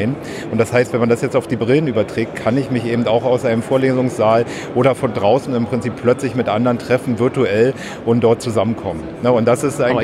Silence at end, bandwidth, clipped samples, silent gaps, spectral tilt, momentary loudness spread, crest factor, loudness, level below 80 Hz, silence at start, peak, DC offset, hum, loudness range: 0 s; 14 kHz; under 0.1%; none; -6.5 dB/octave; 5 LU; 14 dB; -17 LUFS; -50 dBFS; 0 s; -2 dBFS; under 0.1%; none; 1 LU